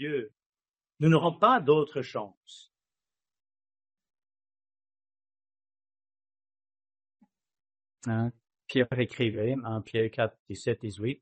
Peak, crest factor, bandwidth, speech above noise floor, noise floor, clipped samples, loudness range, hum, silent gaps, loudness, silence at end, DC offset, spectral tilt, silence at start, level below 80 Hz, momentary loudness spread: -10 dBFS; 22 dB; 8.4 kHz; over 62 dB; under -90 dBFS; under 0.1%; 13 LU; none; 0.46-0.50 s, 2.37-2.41 s, 10.39-10.46 s; -28 LUFS; 0.05 s; under 0.1%; -7 dB/octave; 0 s; -70 dBFS; 13 LU